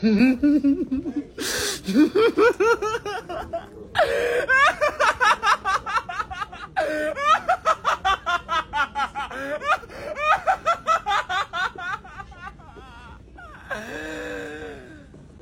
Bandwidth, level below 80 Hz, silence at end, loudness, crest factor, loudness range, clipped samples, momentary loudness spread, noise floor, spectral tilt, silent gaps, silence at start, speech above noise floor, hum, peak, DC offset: 16.5 kHz; -48 dBFS; 0.05 s; -22 LUFS; 16 dB; 10 LU; under 0.1%; 15 LU; -44 dBFS; -4 dB/octave; none; 0 s; 26 dB; none; -6 dBFS; under 0.1%